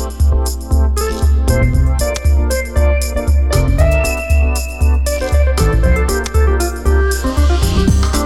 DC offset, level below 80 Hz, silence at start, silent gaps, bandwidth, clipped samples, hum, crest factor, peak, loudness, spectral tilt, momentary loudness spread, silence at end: under 0.1%; -14 dBFS; 0 s; none; 14 kHz; under 0.1%; none; 12 dB; 0 dBFS; -15 LUFS; -5.5 dB/octave; 3 LU; 0 s